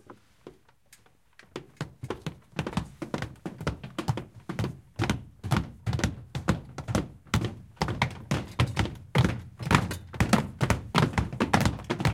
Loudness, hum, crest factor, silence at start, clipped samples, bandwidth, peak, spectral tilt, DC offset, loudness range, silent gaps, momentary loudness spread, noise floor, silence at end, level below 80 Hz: -30 LUFS; none; 26 dB; 0.1 s; under 0.1%; 17 kHz; -4 dBFS; -5.5 dB/octave; under 0.1%; 10 LU; none; 12 LU; -60 dBFS; 0 s; -42 dBFS